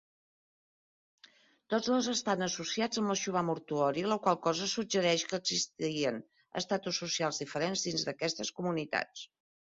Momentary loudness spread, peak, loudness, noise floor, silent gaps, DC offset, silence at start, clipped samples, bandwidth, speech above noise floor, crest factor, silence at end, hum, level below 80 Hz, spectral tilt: 5 LU; -14 dBFS; -33 LUFS; -63 dBFS; none; under 0.1%; 1.7 s; under 0.1%; 7.6 kHz; 30 dB; 20 dB; 0.45 s; none; -74 dBFS; -3 dB/octave